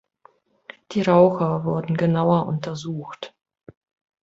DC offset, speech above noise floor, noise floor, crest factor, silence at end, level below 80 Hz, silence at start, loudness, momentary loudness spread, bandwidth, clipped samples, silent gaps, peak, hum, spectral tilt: under 0.1%; 37 dB; -57 dBFS; 20 dB; 0.95 s; -60 dBFS; 0.9 s; -21 LUFS; 18 LU; 7.6 kHz; under 0.1%; none; -2 dBFS; none; -8 dB/octave